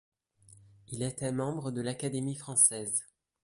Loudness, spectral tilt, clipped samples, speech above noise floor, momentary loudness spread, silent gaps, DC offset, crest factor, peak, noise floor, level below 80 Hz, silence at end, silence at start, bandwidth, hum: -30 LUFS; -4 dB/octave; under 0.1%; 28 dB; 12 LU; none; under 0.1%; 24 dB; -10 dBFS; -60 dBFS; -66 dBFS; 0.4 s; 0.9 s; 12 kHz; none